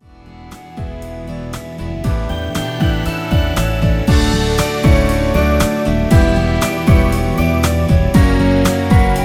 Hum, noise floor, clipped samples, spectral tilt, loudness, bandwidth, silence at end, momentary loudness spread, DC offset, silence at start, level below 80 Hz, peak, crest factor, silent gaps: none; -38 dBFS; under 0.1%; -6 dB/octave; -15 LUFS; 17 kHz; 0 s; 14 LU; under 0.1%; 0.25 s; -20 dBFS; 0 dBFS; 14 dB; none